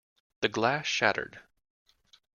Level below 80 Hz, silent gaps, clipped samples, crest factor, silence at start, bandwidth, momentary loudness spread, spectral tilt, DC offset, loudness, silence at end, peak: -70 dBFS; none; under 0.1%; 26 dB; 0.4 s; 10 kHz; 9 LU; -3.5 dB/octave; under 0.1%; -28 LUFS; 0.95 s; -8 dBFS